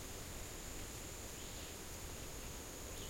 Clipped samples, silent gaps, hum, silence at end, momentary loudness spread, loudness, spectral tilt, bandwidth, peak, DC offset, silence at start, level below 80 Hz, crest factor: under 0.1%; none; none; 0 s; 1 LU; -48 LUFS; -3 dB/octave; 16.5 kHz; -34 dBFS; under 0.1%; 0 s; -54 dBFS; 16 dB